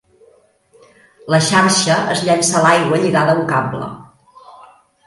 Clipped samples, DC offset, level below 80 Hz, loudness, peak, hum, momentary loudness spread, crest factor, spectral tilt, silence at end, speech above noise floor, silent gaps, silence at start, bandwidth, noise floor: under 0.1%; under 0.1%; -56 dBFS; -14 LUFS; 0 dBFS; none; 8 LU; 16 dB; -4 dB/octave; 0.55 s; 38 dB; none; 1.25 s; 11.5 kHz; -52 dBFS